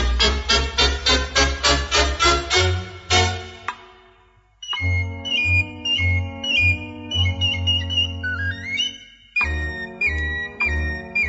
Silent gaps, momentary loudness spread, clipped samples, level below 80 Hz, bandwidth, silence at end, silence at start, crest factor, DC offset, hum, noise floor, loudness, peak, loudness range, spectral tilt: none; 9 LU; under 0.1%; -30 dBFS; 8 kHz; 0 s; 0 s; 18 dB; under 0.1%; none; -55 dBFS; -20 LUFS; -4 dBFS; 5 LU; -3 dB/octave